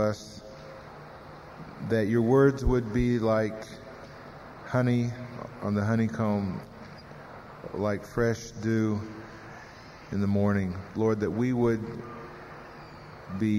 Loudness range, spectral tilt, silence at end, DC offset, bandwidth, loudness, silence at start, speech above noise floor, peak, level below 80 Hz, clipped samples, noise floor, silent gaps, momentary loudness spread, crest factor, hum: 5 LU; -7.5 dB/octave; 0 s; under 0.1%; 15 kHz; -28 LUFS; 0 s; 20 dB; -10 dBFS; -46 dBFS; under 0.1%; -47 dBFS; none; 20 LU; 20 dB; none